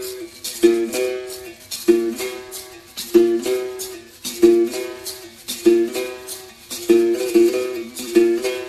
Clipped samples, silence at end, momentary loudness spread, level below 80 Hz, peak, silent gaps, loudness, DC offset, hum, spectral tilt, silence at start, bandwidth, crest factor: under 0.1%; 0 s; 16 LU; -56 dBFS; 0 dBFS; none; -19 LUFS; under 0.1%; none; -3.5 dB/octave; 0 s; 14 kHz; 18 dB